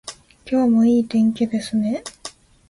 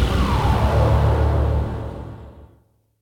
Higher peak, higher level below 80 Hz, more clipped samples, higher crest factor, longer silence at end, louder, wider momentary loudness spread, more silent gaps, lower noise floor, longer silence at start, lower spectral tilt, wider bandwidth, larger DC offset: about the same, -8 dBFS vs -6 dBFS; second, -56 dBFS vs -24 dBFS; neither; about the same, 12 dB vs 14 dB; second, 0.4 s vs 0.55 s; about the same, -19 LUFS vs -19 LUFS; first, 21 LU vs 17 LU; neither; second, -41 dBFS vs -58 dBFS; about the same, 0.05 s vs 0 s; second, -6 dB/octave vs -7.5 dB/octave; second, 11.5 kHz vs 13 kHz; neither